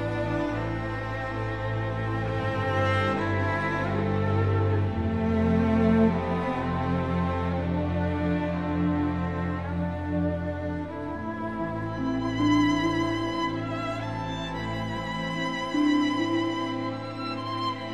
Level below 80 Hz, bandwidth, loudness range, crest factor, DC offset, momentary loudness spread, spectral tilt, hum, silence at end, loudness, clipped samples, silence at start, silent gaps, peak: -44 dBFS; 9.6 kHz; 4 LU; 16 dB; 0.3%; 8 LU; -7 dB/octave; none; 0 s; -27 LUFS; under 0.1%; 0 s; none; -10 dBFS